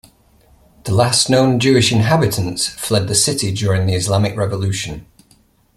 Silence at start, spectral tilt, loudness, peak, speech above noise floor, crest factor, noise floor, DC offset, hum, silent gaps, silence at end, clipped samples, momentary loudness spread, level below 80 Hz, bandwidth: 0.85 s; -4.5 dB/octave; -16 LUFS; 0 dBFS; 39 dB; 16 dB; -54 dBFS; under 0.1%; none; none; 0.75 s; under 0.1%; 8 LU; -44 dBFS; 14.5 kHz